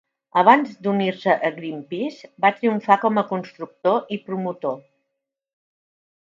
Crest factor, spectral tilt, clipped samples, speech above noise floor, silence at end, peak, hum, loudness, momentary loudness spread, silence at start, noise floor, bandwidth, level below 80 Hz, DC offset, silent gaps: 22 dB; -7 dB/octave; under 0.1%; 60 dB; 1.55 s; 0 dBFS; none; -21 LUFS; 13 LU; 0.35 s; -81 dBFS; 7.6 kHz; -76 dBFS; under 0.1%; none